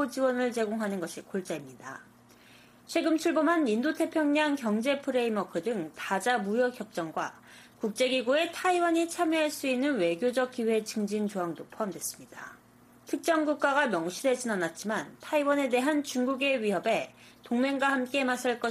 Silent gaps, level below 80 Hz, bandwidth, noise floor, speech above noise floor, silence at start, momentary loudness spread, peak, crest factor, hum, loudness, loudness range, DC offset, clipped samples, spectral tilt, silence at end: none; -76 dBFS; 15.5 kHz; -58 dBFS; 29 dB; 0 s; 10 LU; -14 dBFS; 16 dB; 60 Hz at -60 dBFS; -29 LUFS; 3 LU; under 0.1%; under 0.1%; -4 dB/octave; 0 s